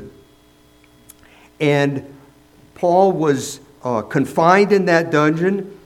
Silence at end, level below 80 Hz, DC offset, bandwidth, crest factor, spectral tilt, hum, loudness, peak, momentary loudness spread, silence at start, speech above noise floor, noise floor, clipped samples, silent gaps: 0.15 s; -58 dBFS; under 0.1%; 15.5 kHz; 18 dB; -6 dB/octave; 60 Hz at -55 dBFS; -17 LUFS; 0 dBFS; 10 LU; 0 s; 35 dB; -51 dBFS; under 0.1%; none